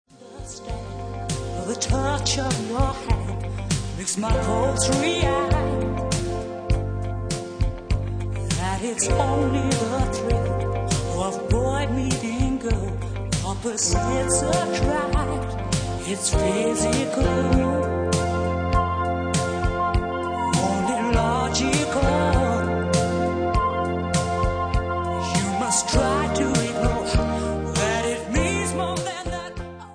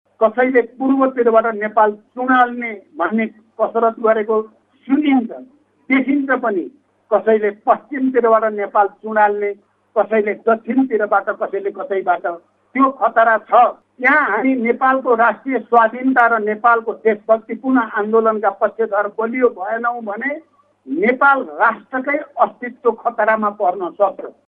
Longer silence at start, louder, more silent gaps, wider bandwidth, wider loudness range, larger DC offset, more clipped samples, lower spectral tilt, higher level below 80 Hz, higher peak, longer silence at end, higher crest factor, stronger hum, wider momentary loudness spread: about the same, 0.2 s vs 0.2 s; second, -23 LUFS vs -17 LUFS; neither; first, 10.5 kHz vs 4.2 kHz; about the same, 3 LU vs 4 LU; neither; neither; second, -5 dB/octave vs -8.5 dB/octave; first, -32 dBFS vs -68 dBFS; second, -6 dBFS vs 0 dBFS; second, 0 s vs 0.2 s; about the same, 16 dB vs 16 dB; neither; about the same, 8 LU vs 9 LU